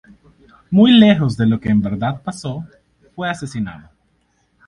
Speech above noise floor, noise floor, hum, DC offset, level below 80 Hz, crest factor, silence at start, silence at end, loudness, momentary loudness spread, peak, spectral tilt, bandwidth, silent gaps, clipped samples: 47 dB; -62 dBFS; none; under 0.1%; -48 dBFS; 18 dB; 0.7 s; 0.9 s; -16 LUFS; 17 LU; 0 dBFS; -7 dB/octave; 11 kHz; none; under 0.1%